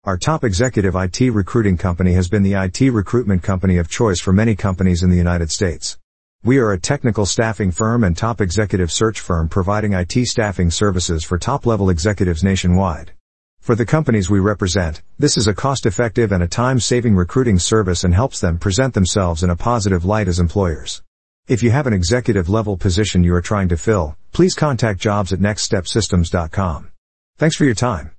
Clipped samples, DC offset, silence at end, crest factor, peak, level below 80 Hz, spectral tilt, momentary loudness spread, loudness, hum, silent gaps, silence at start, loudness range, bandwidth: under 0.1%; 1%; 0.1 s; 14 dB; -2 dBFS; -36 dBFS; -5.5 dB/octave; 4 LU; -17 LUFS; none; 6.04-6.39 s, 13.20-13.57 s, 21.07-21.43 s, 26.98-27.33 s; 0 s; 2 LU; 8.8 kHz